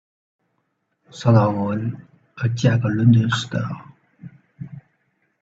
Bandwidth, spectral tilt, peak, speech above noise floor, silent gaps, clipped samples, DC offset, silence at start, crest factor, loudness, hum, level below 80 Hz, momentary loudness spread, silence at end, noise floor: 7.8 kHz; -7 dB/octave; -2 dBFS; 53 dB; none; under 0.1%; under 0.1%; 1.15 s; 20 dB; -20 LUFS; none; -56 dBFS; 22 LU; 0.6 s; -71 dBFS